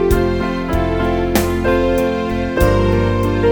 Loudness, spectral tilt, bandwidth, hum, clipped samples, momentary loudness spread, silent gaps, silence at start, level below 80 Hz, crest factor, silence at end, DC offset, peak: -16 LUFS; -6.5 dB/octave; over 20 kHz; none; under 0.1%; 4 LU; none; 0 s; -24 dBFS; 14 dB; 0 s; 0.4%; 0 dBFS